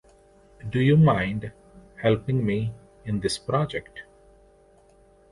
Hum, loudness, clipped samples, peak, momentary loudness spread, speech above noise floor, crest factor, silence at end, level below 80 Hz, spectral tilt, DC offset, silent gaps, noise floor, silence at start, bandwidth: none; -24 LUFS; under 0.1%; -8 dBFS; 22 LU; 34 dB; 18 dB; 1.3 s; -50 dBFS; -7 dB/octave; under 0.1%; none; -56 dBFS; 0.65 s; 11.5 kHz